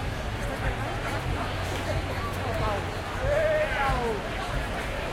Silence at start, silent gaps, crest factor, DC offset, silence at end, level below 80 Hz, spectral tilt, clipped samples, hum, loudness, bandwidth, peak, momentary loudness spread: 0 s; none; 16 dB; under 0.1%; 0 s; -36 dBFS; -5.5 dB/octave; under 0.1%; none; -29 LUFS; 16.5 kHz; -14 dBFS; 6 LU